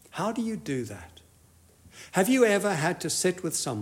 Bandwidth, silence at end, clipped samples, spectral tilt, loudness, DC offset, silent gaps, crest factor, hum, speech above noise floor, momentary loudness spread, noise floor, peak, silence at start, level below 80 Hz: 16 kHz; 0 s; under 0.1%; -4 dB/octave; -27 LUFS; under 0.1%; none; 18 dB; none; 32 dB; 14 LU; -58 dBFS; -10 dBFS; 0.15 s; -66 dBFS